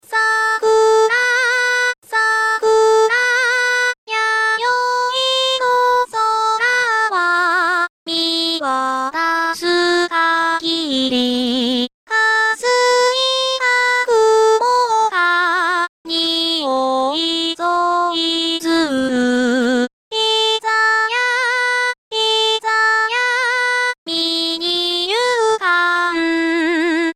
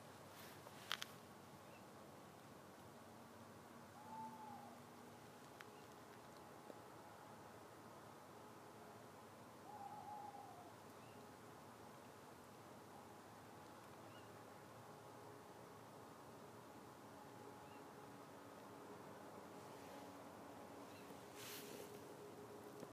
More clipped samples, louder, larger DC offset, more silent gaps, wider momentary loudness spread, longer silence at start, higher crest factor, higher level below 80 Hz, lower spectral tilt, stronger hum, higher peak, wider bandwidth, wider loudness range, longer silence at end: neither; first, -15 LUFS vs -58 LUFS; neither; first, 1.98-2.02 s, 3.98-4.07 s, 7.89-8.06 s, 11.94-12.07 s, 15.89-16.05 s, 19.93-20.11 s, 21.98-22.11 s, 23.98-24.06 s vs none; about the same, 5 LU vs 6 LU; about the same, 0.1 s vs 0 s; second, 10 dB vs 36 dB; first, -60 dBFS vs -88 dBFS; second, -1 dB/octave vs -4 dB/octave; neither; first, -6 dBFS vs -22 dBFS; about the same, 16 kHz vs 15.5 kHz; about the same, 3 LU vs 4 LU; about the same, 0.05 s vs 0 s